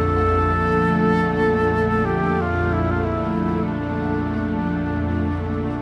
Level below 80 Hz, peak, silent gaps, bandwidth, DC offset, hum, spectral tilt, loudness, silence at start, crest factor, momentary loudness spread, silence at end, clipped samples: -34 dBFS; -6 dBFS; none; 7.4 kHz; under 0.1%; none; -9 dB/octave; -21 LUFS; 0 s; 14 dB; 5 LU; 0 s; under 0.1%